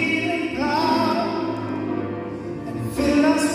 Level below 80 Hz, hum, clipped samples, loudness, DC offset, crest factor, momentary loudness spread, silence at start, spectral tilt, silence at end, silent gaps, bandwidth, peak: -48 dBFS; none; under 0.1%; -23 LUFS; under 0.1%; 16 dB; 12 LU; 0 s; -5 dB/octave; 0 s; none; 16 kHz; -6 dBFS